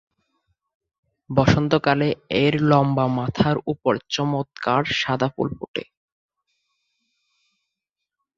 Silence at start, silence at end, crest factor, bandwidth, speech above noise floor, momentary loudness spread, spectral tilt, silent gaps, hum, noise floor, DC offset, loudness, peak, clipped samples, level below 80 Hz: 1.3 s; 2.55 s; 22 dB; 7.4 kHz; 63 dB; 8 LU; -6.5 dB/octave; 5.68-5.74 s; none; -84 dBFS; under 0.1%; -21 LUFS; -2 dBFS; under 0.1%; -50 dBFS